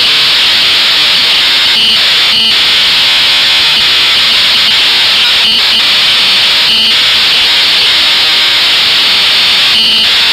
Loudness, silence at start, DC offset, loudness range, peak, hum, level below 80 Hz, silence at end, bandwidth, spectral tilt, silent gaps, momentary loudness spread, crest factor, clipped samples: -4 LUFS; 0 s; under 0.1%; 0 LU; 0 dBFS; none; -42 dBFS; 0 s; 16.5 kHz; 0.5 dB/octave; none; 0 LU; 8 dB; under 0.1%